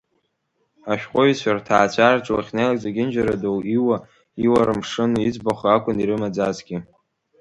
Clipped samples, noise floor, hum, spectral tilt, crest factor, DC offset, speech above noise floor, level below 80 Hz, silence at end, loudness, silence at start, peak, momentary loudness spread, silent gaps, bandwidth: under 0.1%; -71 dBFS; none; -6 dB/octave; 20 dB; under 0.1%; 51 dB; -52 dBFS; 0.55 s; -20 LUFS; 0.85 s; 0 dBFS; 9 LU; none; 11 kHz